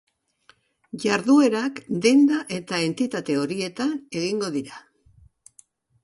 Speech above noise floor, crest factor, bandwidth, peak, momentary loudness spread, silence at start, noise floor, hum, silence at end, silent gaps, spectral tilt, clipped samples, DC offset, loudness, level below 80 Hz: 38 dB; 18 dB; 11.5 kHz; -6 dBFS; 11 LU; 0.95 s; -60 dBFS; none; 1.25 s; none; -5 dB/octave; under 0.1%; under 0.1%; -23 LUFS; -66 dBFS